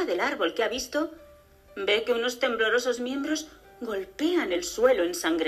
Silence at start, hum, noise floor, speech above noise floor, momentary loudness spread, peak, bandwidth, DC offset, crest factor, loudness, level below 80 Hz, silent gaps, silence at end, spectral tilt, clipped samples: 0 s; none; -54 dBFS; 27 dB; 10 LU; -8 dBFS; 14.5 kHz; under 0.1%; 20 dB; -27 LUFS; -60 dBFS; none; 0 s; -2 dB/octave; under 0.1%